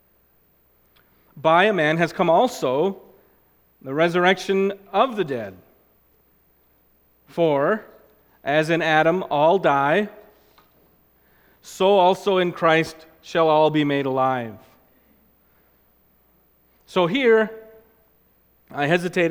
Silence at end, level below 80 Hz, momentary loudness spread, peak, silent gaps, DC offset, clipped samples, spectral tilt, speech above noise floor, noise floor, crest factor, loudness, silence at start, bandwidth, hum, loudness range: 0 s; -64 dBFS; 13 LU; -2 dBFS; none; under 0.1%; under 0.1%; -5.5 dB/octave; 41 dB; -61 dBFS; 20 dB; -20 LUFS; 1.35 s; 16.5 kHz; none; 6 LU